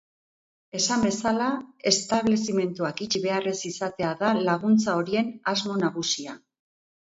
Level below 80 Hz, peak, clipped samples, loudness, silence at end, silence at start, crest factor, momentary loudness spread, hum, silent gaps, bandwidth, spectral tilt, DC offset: -62 dBFS; -6 dBFS; under 0.1%; -25 LUFS; 0.65 s; 0.75 s; 20 dB; 8 LU; none; none; 8 kHz; -4 dB/octave; under 0.1%